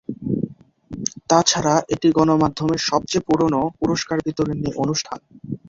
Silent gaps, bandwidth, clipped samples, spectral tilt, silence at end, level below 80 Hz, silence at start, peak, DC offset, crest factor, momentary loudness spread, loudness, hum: none; 7.8 kHz; under 0.1%; -4.5 dB/octave; 0.1 s; -50 dBFS; 0.1 s; -2 dBFS; under 0.1%; 20 dB; 11 LU; -20 LUFS; none